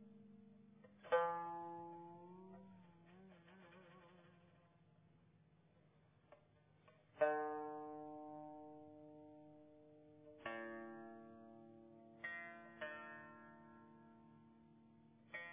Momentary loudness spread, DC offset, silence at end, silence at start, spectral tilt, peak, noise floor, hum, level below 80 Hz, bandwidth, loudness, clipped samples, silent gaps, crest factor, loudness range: 25 LU; under 0.1%; 0 s; 0 s; -3.5 dB/octave; -26 dBFS; -73 dBFS; none; -88 dBFS; 3.8 kHz; -47 LUFS; under 0.1%; none; 26 dB; 19 LU